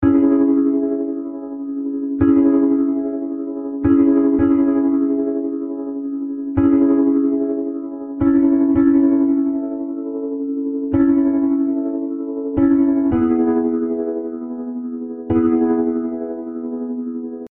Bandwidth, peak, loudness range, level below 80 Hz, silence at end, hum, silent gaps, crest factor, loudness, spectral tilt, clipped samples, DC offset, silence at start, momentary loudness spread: 2.6 kHz; -4 dBFS; 3 LU; -44 dBFS; 0.05 s; none; none; 14 dB; -18 LUFS; -13 dB/octave; under 0.1%; under 0.1%; 0 s; 12 LU